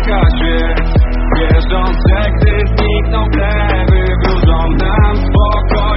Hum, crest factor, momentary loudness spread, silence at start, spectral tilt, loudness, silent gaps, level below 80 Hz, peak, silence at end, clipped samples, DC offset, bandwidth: none; 10 dB; 2 LU; 0 s; -5.5 dB/octave; -13 LUFS; none; -12 dBFS; 0 dBFS; 0 s; under 0.1%; under 0.1%; 5.8 kHz